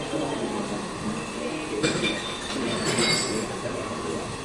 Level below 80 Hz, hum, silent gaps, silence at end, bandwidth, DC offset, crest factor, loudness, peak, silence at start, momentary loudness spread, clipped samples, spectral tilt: -50 dBFS; none; none; 0 s; 11.5 kHz; under 0.1%; 18 dB; -27 LUFS; -10 dBFS; 0 s; 9 LU; under 0.1%; -3.5 dB/octave